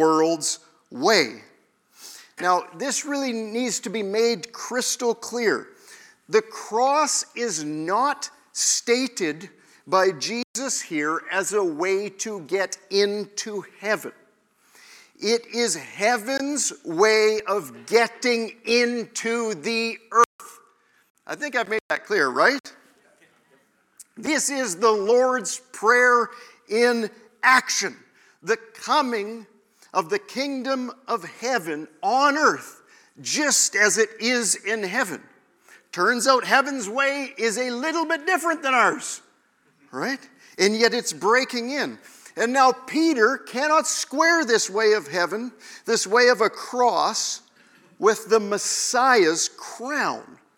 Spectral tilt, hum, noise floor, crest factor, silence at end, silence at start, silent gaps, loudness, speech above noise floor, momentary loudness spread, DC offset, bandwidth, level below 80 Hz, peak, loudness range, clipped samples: -2 dB/octave; none; -63 dBFS; 22 dB; 0.25 s; 0 s; 10.44-10.54 s, 20.26-20.39 s, 21.10-21.15 s, 21.81-21.89 s, 22.60-22.64 s; -22 LUFS; 41 dB; 12 LU; under 0.1%; 18 kHz; -80 dBFS; -2 dBFS; 5 LU; under 0.1%